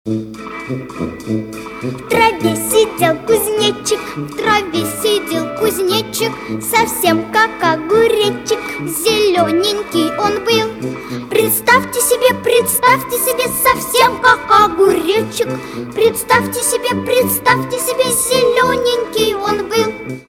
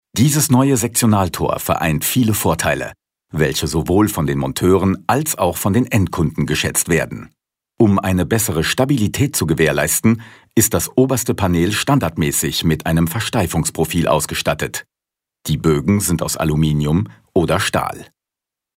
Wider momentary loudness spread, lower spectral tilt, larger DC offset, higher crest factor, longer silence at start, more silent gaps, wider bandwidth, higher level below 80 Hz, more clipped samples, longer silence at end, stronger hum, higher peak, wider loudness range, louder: first, 11 LU vs 5 LU; second, -3 dB/octave vs -5 dB/octave; neither; about the same, 14 dB vs 16 dB; about the same, 0.05 s vs 0.15 s; neither; about the same, 17 kHz vs 16.5 kHz; second, -46 dBFS vs -38 dBFS; neither; second, 0.05 s vs 0.7 s; neither; about the same, 0 dBFS vs 0 dBFS; about the same, 4 LU vs 2 LU; first, -14 LUFS vs -17 LUFS